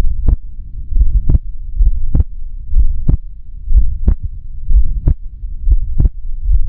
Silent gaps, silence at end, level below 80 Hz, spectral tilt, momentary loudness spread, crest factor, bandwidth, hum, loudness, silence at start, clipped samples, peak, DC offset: none; 0 s; -12 dBFS; -13 dB/octave; 14 LU; 10 dB; 1.1 kHz; none; -19 LUFS; 0 s; under 0.1%; 0 dBFS; under 0.1%